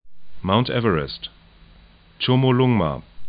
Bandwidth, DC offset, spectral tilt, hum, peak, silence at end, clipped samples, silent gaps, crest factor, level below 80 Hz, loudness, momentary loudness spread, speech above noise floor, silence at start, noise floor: 5 kHz; under 0.1%; -11.5 dB/octave; none; -2 dBFS; 0 s; under 0.1%; none; 18 dB; -46 dBFS; -20 LUFS; 14 LU; 30 dB; 0.05 s; -50 dBFS